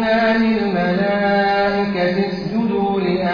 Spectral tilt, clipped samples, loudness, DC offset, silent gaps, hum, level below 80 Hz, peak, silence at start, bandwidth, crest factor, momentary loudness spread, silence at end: -8 dB/octave; under 0.1%; -18 LUFS; under 0.1%; none; none; -46 dBFS; -6 dBFS; 0 s; 5.2 kHz; 10 dB; 4 LU; 0 s